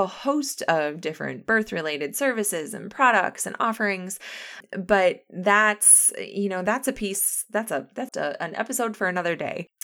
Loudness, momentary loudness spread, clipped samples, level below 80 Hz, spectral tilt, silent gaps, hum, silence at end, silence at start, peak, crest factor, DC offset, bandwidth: -23 LUFS; 13 LU; under 0.1%; -62 dBFS; -2.5 dB/octave; none; none; 0.2 s; 0 s; -4 dBFS; 20 dB; under 0.1%; over 20 kHz